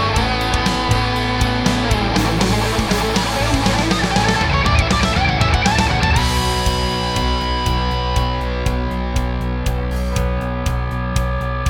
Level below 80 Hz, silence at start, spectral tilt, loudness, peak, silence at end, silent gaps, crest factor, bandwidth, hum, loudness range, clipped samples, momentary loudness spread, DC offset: -22 dBFS; 0 s; -4.5 dB/octave; -18 LUFS; 0 dBFS; 0 s; none; 18 dB; 18 kHz; none; 5 LU; under 0.1%; 6 LU; under 0.1%